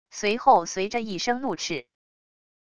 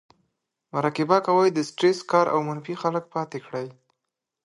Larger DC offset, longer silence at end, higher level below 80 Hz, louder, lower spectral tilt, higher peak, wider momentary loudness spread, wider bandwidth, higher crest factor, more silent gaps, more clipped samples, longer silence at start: neither; about the same, 0.65 s vs 0.75 s; first, -62 dBFS vs -74 dBFS; about the same, -25 LUFS vs -24 LUFS; second, -3 dB/octave vs -6 dB/octave; about the same, -6 dBFS vs -4 dBFS; about the same, 10 LU vs 12 LU; about the same, 10 kHz vs 11 kHz; about the same, 20 dB vs 22 dB; neither; neither; second, 0.05 s vs 0.75 s